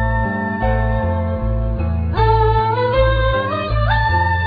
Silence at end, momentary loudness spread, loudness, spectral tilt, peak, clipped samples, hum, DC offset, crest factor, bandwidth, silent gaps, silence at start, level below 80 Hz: 0 s; 6 LU; -17 LUFS; -9.5 dB/octave; -2 dBFS; under 0.1%; none; under 0.1%; 14 dB; 5 kHz; none; 0 s; -22 dBFS